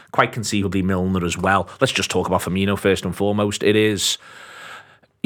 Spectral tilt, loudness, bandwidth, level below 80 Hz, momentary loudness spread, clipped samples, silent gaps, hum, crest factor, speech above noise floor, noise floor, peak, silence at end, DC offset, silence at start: -4.5 dB/octave; -20 LUFS; 18.5 kHz; -50 dBFS; 14 LU; under 0.1%; none; none; 20 dB; 26 dB; -46 dBFS; 0 dBFS; 0.45 s; under 0.1%; 0.15 s